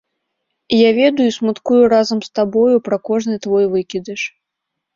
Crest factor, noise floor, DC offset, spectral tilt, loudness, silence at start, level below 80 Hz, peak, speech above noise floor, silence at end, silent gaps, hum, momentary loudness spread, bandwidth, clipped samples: 14 dB; -78 dBFS; under 0.1%; -5.5 dB/octave; -15 LUFS; 0.7 s; -58 dBFS; -2 dBFS; 64 dB; 0.65 s; none; none; 11 LU; 7.6 kHz; under 0.1%